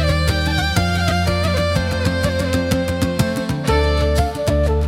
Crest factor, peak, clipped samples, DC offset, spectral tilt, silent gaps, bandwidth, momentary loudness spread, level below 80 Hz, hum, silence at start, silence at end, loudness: 16 dB; -2 dBFS; under 0.1%; under 0.1%; -5.5 dB/octave; none; 16 kHz; 2 LU; -26 dBFS; none; 0 s; 0 s; -18 LUFS